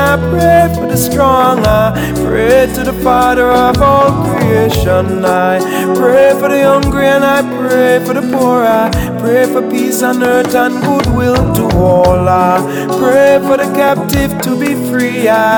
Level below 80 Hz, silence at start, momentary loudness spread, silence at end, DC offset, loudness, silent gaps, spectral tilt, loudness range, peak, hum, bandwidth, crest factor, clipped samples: -28 dBFS; 0 s; 5 LU; 0 s; under 0.1%; -10 LUFS; none; -5.5 dB/octave; 1 LU; 0 dBFS; none; over 20 kHz; 10 dB; under 0.1%